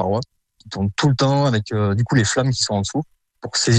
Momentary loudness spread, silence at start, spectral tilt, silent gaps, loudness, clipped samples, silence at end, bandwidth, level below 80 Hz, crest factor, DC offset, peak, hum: 15 LU; 0 s; -5 dB/octave; none; -20 LUFS; under 0.1%; 0 s; 9.4 kHz; -50 dBFS; 16 dB; under 0.1%; -4 dBFS; none